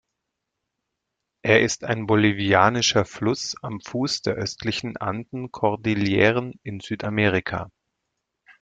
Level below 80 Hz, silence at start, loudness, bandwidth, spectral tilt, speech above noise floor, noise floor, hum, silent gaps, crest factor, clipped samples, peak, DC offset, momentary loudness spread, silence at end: -56 dBFS; 1.45 s; -22 LUFS; 9.2 kHz; -4.5 dB/octave; 59 dB; -81 dBFS; none; none; 22 dB; under 0.1%; -2 dBFS; under 0.1%; 14 LU; 0.95 s